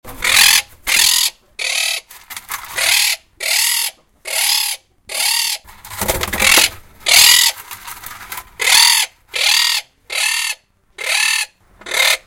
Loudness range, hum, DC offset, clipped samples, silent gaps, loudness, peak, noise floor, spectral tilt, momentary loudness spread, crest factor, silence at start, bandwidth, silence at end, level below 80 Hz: 5 LU; none; under 0.1%; under 0.1%; none; -13 LUFS; 0 dBFS; -36 dBFS; 1.5 dB/octave; 20 LU; 16 dB; 0.05 s; over 20 kHz; 0.1 s; -44 dBFS